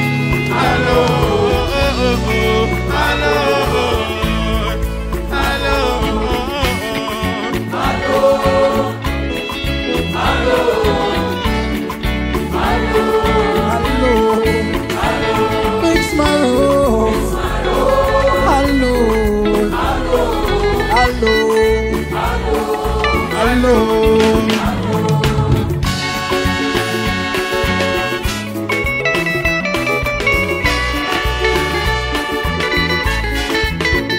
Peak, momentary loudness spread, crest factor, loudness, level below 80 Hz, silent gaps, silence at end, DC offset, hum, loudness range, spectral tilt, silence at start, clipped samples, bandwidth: 0 dBFS; 6 LU; 14 dB; -15 LUFS; -24 dBFS; none; 0 s; under 0.1%; none; 2 LU; -5 dB/octave; 0 s; under 0.1%; 16.5 kHz